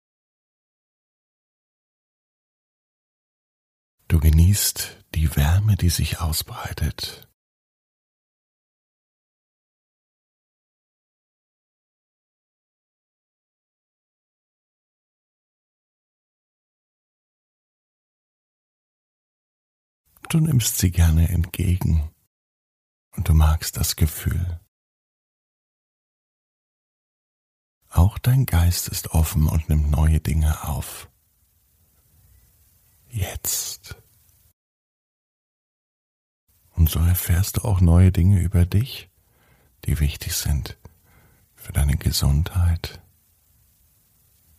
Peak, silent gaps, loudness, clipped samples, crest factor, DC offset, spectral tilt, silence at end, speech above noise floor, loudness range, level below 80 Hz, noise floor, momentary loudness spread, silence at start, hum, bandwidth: -4 dBFS; 7.34-20.05 s, 22.27-23.11 s, 24.68-27.81 s, 34.53-36.47 s; -21 LUFS; under 0.1%; 20 dB; under 0.1%; -5 dB/octave; 1.6 s; 44 dB; 11 LU; -30 dBFS; -63 dBFS; 13 LU; 4.1 s; none; 15.5 kHz